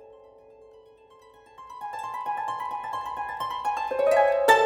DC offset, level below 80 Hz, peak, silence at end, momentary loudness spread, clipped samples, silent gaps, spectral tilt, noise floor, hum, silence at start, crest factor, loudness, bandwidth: under 0.1%; -64 dBFS; -4 dBFS; 0 s; 17 LU; under 0.1%; none; -2 dB/octave; -54 dBFS; none; 0 s; 22 dB; -27 LUFS; over 20 kHz